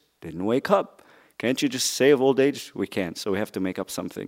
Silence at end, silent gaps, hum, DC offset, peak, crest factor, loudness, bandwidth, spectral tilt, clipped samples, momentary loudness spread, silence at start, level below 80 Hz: 0 s; none; none; under 0.1%; -4 dBFS; 20 dB; -24 LUFS; 16 kHz; -4 dB/octave; under 0.1%; 12 LU; 0.25 s; -66 dBFS